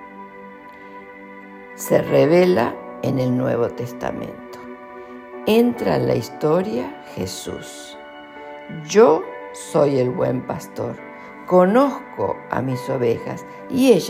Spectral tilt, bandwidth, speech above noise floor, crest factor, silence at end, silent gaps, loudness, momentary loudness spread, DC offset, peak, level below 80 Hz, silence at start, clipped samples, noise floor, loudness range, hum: -6 dB/octave; 16 kHz; 21 dB; 18 dB; 0 s; none; -20 LUFS; 23 LU; under 0.1%; -2 dBFS; -56 dBFS; 0 s; under 0.1%; -39 dBFS; 3 LU; none